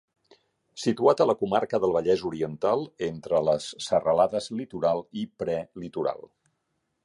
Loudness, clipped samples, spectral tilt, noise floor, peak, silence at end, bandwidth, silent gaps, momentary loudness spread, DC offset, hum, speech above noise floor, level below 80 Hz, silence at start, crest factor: -26 LUFS; under 0.1%; -5.5 dB/octave; -77 dBFS; -6 dBFS; 0.85 s; 11.5 kHz; none; 10 LU; under 0.1%; none; 51 dB; -62 dBFS; 0.75 s; 20 dB